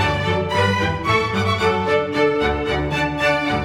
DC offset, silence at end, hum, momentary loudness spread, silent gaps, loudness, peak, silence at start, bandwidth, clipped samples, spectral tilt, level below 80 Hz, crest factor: under 0.1%; 0 s; none; 3 LU; none; -19 LUFS; -4 dBFS; 0 s; 15 kHz; under 0.1%; -5.5 dB/octave; -36 dBFS; 14 dB